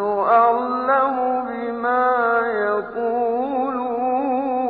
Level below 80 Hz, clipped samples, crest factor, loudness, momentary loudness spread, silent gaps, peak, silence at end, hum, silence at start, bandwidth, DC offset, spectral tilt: -60 dBFS; under 0.1%; 16 dB; -20 LUFS; 7 LU; none; -4 dBFS; 0 s; none; 0 s; 4.8 kHz; under 0.1%; -9 dB/octave